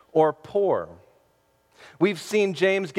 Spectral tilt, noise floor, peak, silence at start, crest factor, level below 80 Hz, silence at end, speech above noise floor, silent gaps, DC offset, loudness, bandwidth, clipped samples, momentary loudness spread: -5.5 dB/octave; -65 dBFS; -8 dBFS; 0.15 s; 18 dB; -68 dBFS; 0 s; 42 dB; none; under 0.1%; -24 LUFS; 14.5 kHz; under 0.1%; 5 LU